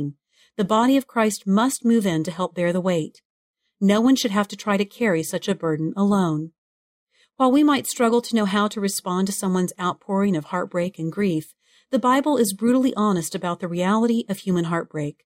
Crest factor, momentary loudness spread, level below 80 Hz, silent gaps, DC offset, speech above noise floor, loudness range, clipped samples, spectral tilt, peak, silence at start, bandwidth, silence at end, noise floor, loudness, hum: 16 dB; 8 LU; -64 dBFS; 3.25-3.54 s, 6.58-7.07 s; under 0.1%; 19 dB; 2 LU; under 0.1%; -5.5 dB/octave; -6 dBFS; 0 s; 16 kHz; 0.15 s; -40 dBFS; -22 LUFS; none